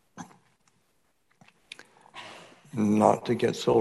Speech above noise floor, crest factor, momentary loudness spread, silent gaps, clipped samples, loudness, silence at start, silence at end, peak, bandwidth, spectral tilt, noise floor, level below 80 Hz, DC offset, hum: 49 dB; 24 dB; 25 LU; none; under 0.1%; -25 LUFS; 0.15 s; 0 s; -4 dBFS; 12.5 kHz; -6 dB/octave; -72 dBFS; -66 dBFS; under 0.1%; none